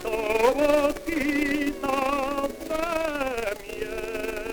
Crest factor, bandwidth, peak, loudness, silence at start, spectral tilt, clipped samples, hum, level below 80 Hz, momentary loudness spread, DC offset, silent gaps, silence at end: 18 dB; over 20 kHz; -8 dBFS; -26 LUFS; 0 s; -4 dB/octave; under 0.1%; none; -44 dBFS; 10 LU; under 0.1%; none; 0 s